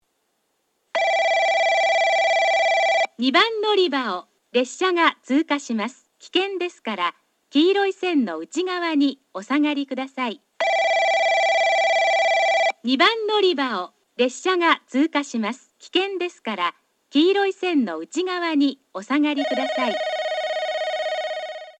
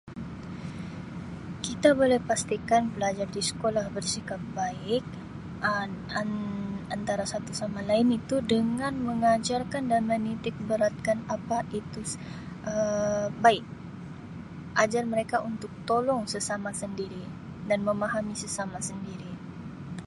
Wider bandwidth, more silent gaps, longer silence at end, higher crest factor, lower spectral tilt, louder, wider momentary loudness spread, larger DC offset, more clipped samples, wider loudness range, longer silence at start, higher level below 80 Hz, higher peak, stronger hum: second, 9.2 kHz vs 11.5 kHz; neither; about the same, 0.1 s vs 0 s; second, 18 dB vs 24 dB; second, -2.5 dB/octave vs -4.5 dB/octave; first, -21 LUFS vs -29 LUFS; second, 9 LU vs 15 LU; neither; neither; about the same, 5 LU vs 5 LU; first, 0.95 s vs 0.05 s; second, -82 dBFS vs -54 dBFS; about the same, -4 dBFS vs -6 dBFS; neither